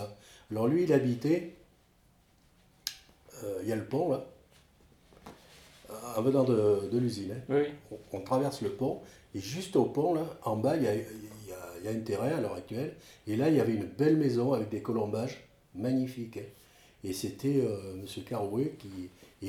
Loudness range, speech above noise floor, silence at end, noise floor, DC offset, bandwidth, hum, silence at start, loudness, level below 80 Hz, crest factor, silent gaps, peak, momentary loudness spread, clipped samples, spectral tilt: 7 LU; 34 dB; 0 s; -65 dBFS; under 0.1%; 18 kHz; none; 0 s; -32 LUFS; -66 dBFS; 20 dB; none; -12 dBFS; 18 LU; under 0.1%; -7 dB/octave